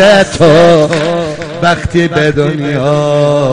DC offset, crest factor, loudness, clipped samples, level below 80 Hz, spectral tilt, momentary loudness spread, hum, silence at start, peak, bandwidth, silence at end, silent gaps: under 0.1%; 8 dB; -9 LUFS; 0.8%; -34 dBFS; -6 dB/octave; 8 LU; none; 0 s; 0 dBFS; 10.5 kHz; 0 s; none